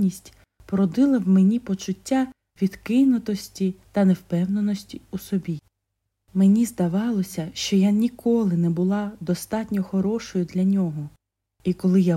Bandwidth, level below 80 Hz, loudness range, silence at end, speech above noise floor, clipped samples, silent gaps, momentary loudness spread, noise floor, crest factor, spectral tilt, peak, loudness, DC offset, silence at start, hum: 13.5 kHz; -56 dBFS; 3 LU; 0 s; 57 dB; under 0.1%; none; 11 LU; -79 dBFS; 14 dB; -7 dB/octave; -10 dBFS; -23 LUFS; under 0.1%; 0 s; none